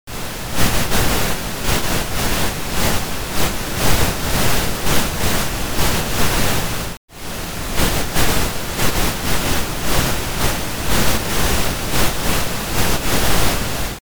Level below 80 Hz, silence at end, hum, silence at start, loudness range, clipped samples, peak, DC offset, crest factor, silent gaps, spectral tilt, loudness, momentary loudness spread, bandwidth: -26 dBFS; 0.05 s; none; 0.05 s; 2 LU; under 0.1%; 0 dBFS; 8%; 16 dB; 6.97-7.08 s; -3.5 dB/octave; -19 LUFS; 5 LU; over 20 kHz